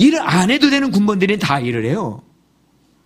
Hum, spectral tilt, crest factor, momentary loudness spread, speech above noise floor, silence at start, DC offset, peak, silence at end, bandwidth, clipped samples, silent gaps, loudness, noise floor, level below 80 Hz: none; -5.5 dB/octave; 16 dB; 9 LU; 41 dB; 0 s; under 0.1%; 0 dBFS; 0.85 s; 15.5 kHz; under 0.1%; none; -15 LUFS; -57 dBFS; -52 dBFS